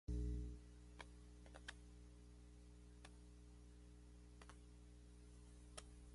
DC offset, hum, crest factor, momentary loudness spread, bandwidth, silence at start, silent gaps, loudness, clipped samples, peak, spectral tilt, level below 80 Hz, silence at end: under 0.1%; 60 Hz at -60 dBFS; 18 dB; 13 LU; 11.5 kHz; 0.1 s; none; -59 LUFS; under 0.1%; -36 dBFS; -5.5 dB/octave; -56 dBFS; 0 s